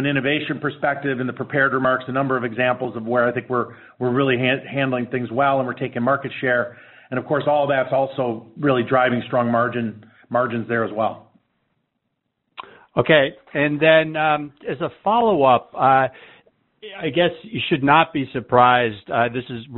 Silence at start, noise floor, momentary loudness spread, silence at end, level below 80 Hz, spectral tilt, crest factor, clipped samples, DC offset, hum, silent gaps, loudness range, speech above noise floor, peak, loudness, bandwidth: 0 s; -75 dBFS; 10 LU; 0 s; -58 dBFS; -4 dB/octave; 20 dB; under 0.1%; under 0.1%; none; none; 4 LU; 55 dB; 0 dBFS; -20 LUFS; 4.2 kHz